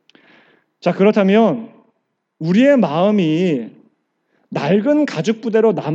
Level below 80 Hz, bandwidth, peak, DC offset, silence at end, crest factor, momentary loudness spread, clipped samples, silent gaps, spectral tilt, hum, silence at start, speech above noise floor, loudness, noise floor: -82 dBFS; 7.8 kHz; -2 dBFS; under 0.1%; 0 s; 14 dB; 11 LU; under 0.1%; none; -7.5 dB/octave; none; 0.85 s; 56 dB; -16 LUFS; -70 dBFS